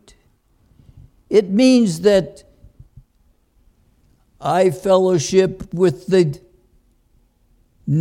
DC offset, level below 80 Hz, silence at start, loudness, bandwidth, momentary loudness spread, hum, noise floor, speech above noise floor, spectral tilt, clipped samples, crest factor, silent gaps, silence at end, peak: under 0.1%; -50 dBFS; 1.3 s; -16 LUFS; 13.5 kHz; 10 LU; none; -59 dBFS; 43 dB; -6 dB/octave; under 0.1%; 18 dB; none; 0 s; -2 dBFS